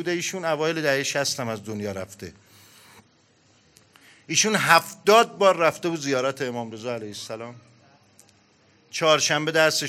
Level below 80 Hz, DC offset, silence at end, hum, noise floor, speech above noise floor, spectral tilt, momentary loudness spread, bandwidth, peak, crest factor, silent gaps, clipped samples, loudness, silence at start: -74 dBFS; under 0.1%; 0 s; none; -60 dBFS; 37 dB; -2.5 dB/octave; 17 LU; 16 kHz; 0 dBFS; 24 dB; none; under 0.1%; -22 LUFS; 0 s